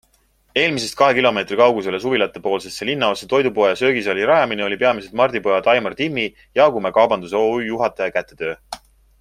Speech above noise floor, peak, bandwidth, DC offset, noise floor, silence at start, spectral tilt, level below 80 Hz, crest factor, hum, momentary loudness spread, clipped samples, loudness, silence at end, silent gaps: 42 dB; 0 dBFS; 14.5 kHz; under 0.1%; -60 dBFS; 0.55 s; -4.5 dB/octave; -56 dBFS; 18 dB; none; 8 LU; under 0.1%; -18 LUFS; 0.45 s; none